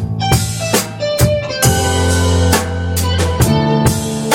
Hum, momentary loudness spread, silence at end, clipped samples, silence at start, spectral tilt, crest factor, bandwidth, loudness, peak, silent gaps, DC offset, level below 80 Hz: none; 4 LU; 0 s; under 0.1%; 0 s; -4.5 dB/octave; 14 dB; 17 kHz; -14 LUFS; 0 dBFS; none; under 0.1%; -26 dBFS